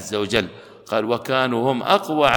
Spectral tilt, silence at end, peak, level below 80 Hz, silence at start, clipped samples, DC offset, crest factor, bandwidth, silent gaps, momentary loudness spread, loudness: -4.5 dB/octave; 0 s; -2 dBFS; -52 dBFS; 0 s; under 0.1%; under 0.1%; 18 dB; 19 kHz; none; 6 LU; -21 LUFS